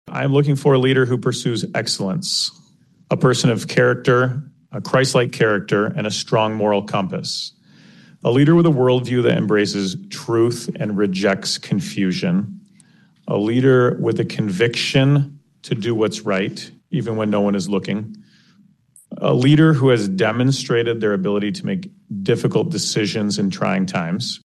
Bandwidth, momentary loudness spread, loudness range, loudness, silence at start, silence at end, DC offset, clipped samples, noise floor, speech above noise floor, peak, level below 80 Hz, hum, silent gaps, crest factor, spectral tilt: 12.5 kHz; 10 LU; 4 LU; -18 LUFS; 0.05 s; 0.1 s; under 0.1%; under 0.1%; -54 dBFS; 36 dB; -4 dBFS; -58 dBFS; none; none; 16 dB; -5.5 dB/octave